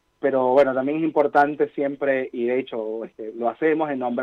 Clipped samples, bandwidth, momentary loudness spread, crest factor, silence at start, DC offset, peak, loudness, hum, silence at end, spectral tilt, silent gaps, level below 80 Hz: under 0.1%; 6.8 kHz; 11 LU; 16 dB; 0.2 s; under 0.1%; -6 dBFS; -22 LUFS; none; 0 s; -7.5 dB/octave; none; -68 dBFS